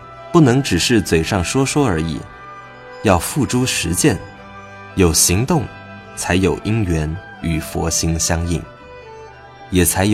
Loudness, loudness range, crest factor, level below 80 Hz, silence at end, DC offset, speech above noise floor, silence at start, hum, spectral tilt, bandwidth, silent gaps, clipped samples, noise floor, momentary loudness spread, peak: -17 LUFS; 3 LU; 18 dB; -34 dBFS; 0 s; under 0.1%; 22 dB; 0 s; none; -4.5 dB/octave; 16.5 kHz; none; under 0.1%; -38 dBFS; 22 LU; 0 dBFS